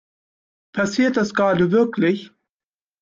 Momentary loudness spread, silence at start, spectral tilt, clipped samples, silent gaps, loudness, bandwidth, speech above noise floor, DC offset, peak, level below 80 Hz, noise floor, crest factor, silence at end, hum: 8 LU; 0.75 s; -6 dB/octave; under 0.1%; none; -19 LUFS; 7.6 kHz; over 72 dB; under 0.1%; -6 dBFS; -60 dBFS; under -90 dBFS; 16 dB; 0.75 s; none